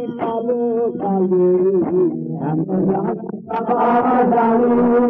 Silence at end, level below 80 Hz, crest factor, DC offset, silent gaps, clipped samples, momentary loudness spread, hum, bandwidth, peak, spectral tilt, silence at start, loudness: 0 s; -54 dBFS; 10 dB; under 0.1%; none; under 0.1%; 8 LU; none; 3.7 kHz; -6 dBFS; -11.5 dB/octave; 0 s; -17 LUFS